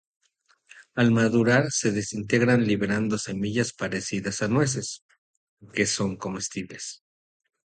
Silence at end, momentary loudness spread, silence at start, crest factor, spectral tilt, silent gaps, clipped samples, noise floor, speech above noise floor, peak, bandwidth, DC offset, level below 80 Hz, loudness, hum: 0.8 s; 13 LU; 0.75 s; 20 dB; -5 dB/octave; 5.02-5.09 s, 5.18-5.57 s; under 0.1%; -66 dBFS; 42 dB; -6 dBFS; 9.4 kHz; under 0.1%; -58 dBFS; -25 LUFS; none